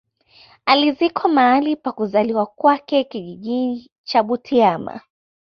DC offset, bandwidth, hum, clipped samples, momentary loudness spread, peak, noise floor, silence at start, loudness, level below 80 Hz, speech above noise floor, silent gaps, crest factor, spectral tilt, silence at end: under 0.1%; 6.4 kHz; none; under 0.1%; 13 LU; -2 dBFS; -51 dBFS; 0.65 s; -18 LUFS; -62 dBFS; 33 dB; 3.92-4.04 s; 18 dB; -6.5 dB/octave; 0.6 s